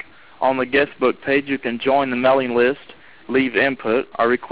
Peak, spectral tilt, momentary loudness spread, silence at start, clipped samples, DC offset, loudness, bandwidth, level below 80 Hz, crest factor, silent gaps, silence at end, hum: -6 dBFS; -8.5 dB/octave; 6 LU; 0.4 s; under 0.1%; 0.4%; -19 LUFS; 4 kHz; -56 dBFS; 14 dB; none; 0 s; none